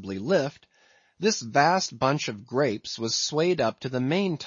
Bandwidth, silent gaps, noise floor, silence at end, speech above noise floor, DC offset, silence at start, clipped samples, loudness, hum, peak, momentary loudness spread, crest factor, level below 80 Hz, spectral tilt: 7.6 kHz; none; -62 dBFS; 0 s; 36 dB; under 0.1%; 0 s; under 0.1%; -26 LUFS; none; -6 dBFS; 7 LU; 20 dB; -66 dBFS; -4 dB/octave